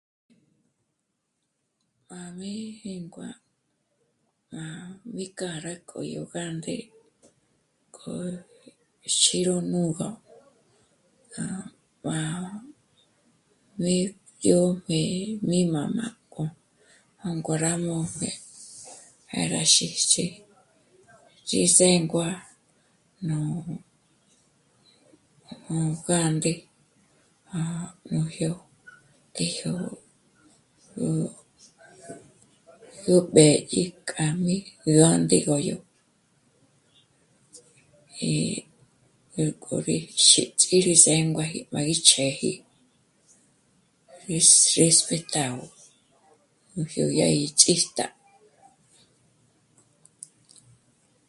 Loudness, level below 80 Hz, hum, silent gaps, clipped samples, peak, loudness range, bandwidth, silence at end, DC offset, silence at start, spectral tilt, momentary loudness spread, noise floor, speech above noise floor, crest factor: -23 LUFS; -64 dBFS; none; none; under 0.1%; 0 dBFS; 16 LU; 11.5 kHz; 3.2 s; under 0.1%; 2.1 s; -3.5 dB/octave; 22 LU; -78 dBFS; 54 dB; 28 dB